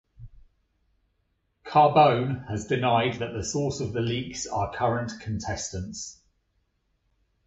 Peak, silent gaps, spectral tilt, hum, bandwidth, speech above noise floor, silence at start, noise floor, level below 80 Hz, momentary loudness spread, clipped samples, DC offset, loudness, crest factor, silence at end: -6 dBFS; none; -5 dB/octave; none; 8.2 kHz; 48 dB; 0.2 s; -73 dBFS; -50 dBFS; 13 LU; under 0.1%; under 0.1%; -26 LUFS; 20 dB; 1.35 s